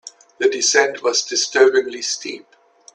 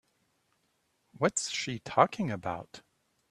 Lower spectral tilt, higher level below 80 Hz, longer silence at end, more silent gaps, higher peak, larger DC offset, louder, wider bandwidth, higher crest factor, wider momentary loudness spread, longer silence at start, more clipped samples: second, 0.5 dB/octave vs -4 dB/octave; about the same, -70 dBFS vs -70 dBFS; about the same, 0.55 s vs 0.5 s; neither; first, 0 dBFS vs -6 dBFS; neither; first, -17 LUFS vs -30 LUFS; second, 10 kHz vs 13.5 kHz; second, 18 dB vs 28 dB; about the same, 11 LU vs 12 LU; second, 0.05 s vs 1.15 s; neither